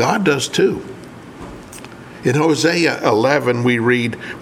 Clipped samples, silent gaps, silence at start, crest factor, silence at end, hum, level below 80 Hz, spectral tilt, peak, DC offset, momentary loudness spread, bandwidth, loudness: under 0.1%; none; 0 s; 18 dB; 0 s; none; -52 dBFS; -5 dB/octave; 0 dBFS; under 0.1%; 20 LU; 16 kHz; -16 LUFS